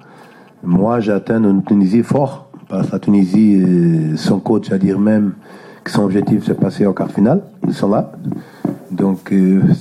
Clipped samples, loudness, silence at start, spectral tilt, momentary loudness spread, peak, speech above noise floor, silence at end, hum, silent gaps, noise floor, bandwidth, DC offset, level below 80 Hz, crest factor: under 0.1%; -15 LUFS; 0.65 s; -8.5 dB/octave; 12 LU; -4 dBFS; 28 dB; 0 s; none; none; -42 dBFS; 11.5 kHz; under 0.1%; -52 dBFS; 12 dB